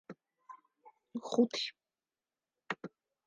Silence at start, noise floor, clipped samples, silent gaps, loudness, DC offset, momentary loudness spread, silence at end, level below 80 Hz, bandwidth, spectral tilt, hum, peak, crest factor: 0.1 s; under -90 dBFS; under 0.1%; none; -36 LUFS; under 0.1%; 25 LU; 0.4 s; under -90 dBFS; 9.2 kHz; -4 dB/octave; none; -16 dBFS; 24 dB